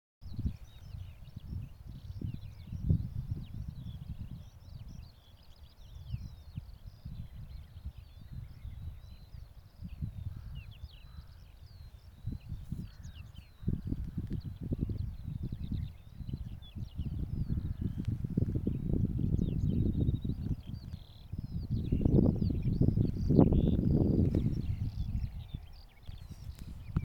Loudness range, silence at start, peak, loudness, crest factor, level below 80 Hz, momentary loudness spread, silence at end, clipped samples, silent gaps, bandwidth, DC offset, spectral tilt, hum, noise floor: 18 LU; 0.2 s; -8 dBFS; -35 LUFS; 26 dB; -42 dBFS; 22 LU; 0 s; under 0.1%; none; 18 kHz; under 0.1%; -10 dB/octave; none; -56 dBFS